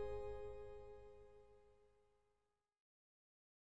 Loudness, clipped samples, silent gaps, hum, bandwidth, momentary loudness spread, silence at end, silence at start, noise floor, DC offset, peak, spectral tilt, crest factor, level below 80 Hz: -54 LUFS; under 0.1%; none; none; 10 kHz; 17 LU; 0.9 s; 0 s; -88 dBFS; under 0.1%; -36 dBFS; -7 dB/octave; 18 dB; -66 dBFS